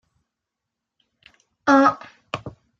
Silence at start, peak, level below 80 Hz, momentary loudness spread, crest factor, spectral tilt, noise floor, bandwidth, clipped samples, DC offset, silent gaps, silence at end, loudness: 1.65 s; -4 dBFS; -62 dBFS; 18 LU; 22 dB; -5 dB/octave; -84 dBFS; 7.6 kHz; under 0.1%; under 0.1%; none; 0.3 s; -18 LUFS